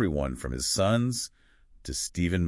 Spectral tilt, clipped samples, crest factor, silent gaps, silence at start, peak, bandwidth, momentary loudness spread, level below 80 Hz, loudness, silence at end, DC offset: -4.5 dB/octave; under 0.1%; 18 dB; none; 0 s; -12 dBFS; 12 kHz; 12 LU; -44 dBFS; -29 LUFS; 0 s; under 0.1%